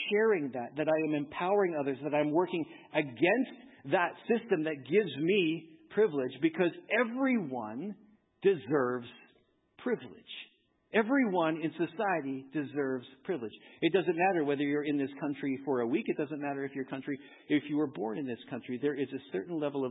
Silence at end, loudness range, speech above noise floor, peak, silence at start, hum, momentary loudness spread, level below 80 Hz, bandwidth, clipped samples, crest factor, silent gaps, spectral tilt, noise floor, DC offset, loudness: 0 s; 4 LU; 38 dB; -14 dBFS; 0 s; none; 10 LU; -80 dBFS; 4 kHz; under 0.1%; 18 dB; none; -10 dB/octave; -69 dBFS; under 0.1%; -32 LUFS